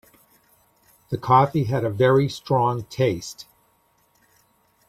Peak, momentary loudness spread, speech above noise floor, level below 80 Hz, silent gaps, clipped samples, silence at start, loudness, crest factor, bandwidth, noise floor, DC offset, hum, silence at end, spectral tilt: -4 dBFS; 14 LU; 43 dB; -56 dBFS; none; under 0.1%; 1.1 s; -21 LUFS; 20 dB; 14.5 kHz; -64 dBFS; under 0.1%; none; 1.45 s; -7 dB/octave